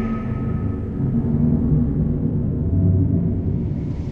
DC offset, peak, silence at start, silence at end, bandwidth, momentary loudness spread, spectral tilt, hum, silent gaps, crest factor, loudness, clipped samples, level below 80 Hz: 0.1%; -6 dBFS; 0 s; 0 s; 3.1 kHz; 6 LU; -12 dB/octave; none; none; 14 dB; -21 LUFS; under 0.1%; -30 dBFS